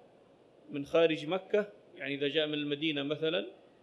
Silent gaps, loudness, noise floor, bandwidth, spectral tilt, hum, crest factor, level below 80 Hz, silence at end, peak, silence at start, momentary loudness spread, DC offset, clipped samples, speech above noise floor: none; -32 LUFS; -61 dBFS; 10.5 kHz; -6 dB/octave; none; 20 dB; -78 dBFS; 0.3 s; -14 dBFS; 0.7 s; 14 LU; under 0.1%; under 0.1%; 29 dB